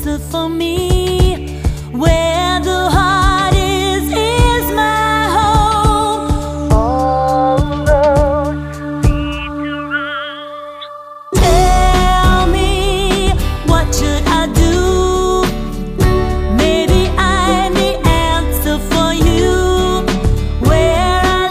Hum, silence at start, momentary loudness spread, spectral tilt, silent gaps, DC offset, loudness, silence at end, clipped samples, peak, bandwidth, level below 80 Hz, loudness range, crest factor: none; 0 s; 8 LU; -5 dB/octave; none; under 0.1%; -14 LUFS; 0 s; under 0.1%; 0 dBFS; 15.5 kHz; -18 dBFS; 3 LU; 12 dB